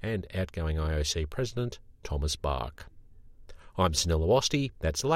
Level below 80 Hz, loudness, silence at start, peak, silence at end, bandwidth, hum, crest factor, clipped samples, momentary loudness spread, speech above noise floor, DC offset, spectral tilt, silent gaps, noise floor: -40 dBFS; -30 LUFS; 0 s; -12 dBFS; 0 s; 16 kHz; none; 18 dB; under 0.1%; 12 LU; 21 dB; under 0.1%; -4.5 dB/octave; none; -50 dBFS